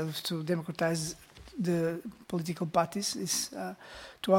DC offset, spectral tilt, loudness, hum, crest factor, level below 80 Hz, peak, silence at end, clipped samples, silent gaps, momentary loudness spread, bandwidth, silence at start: under 0.1%; -4.5 dB/octave; -33 LUFS; none; 20 dB; -64 dBFS; -12 dBFS; 0 s; under 0.1%; none; 12 LU; 17 kHz; 0 s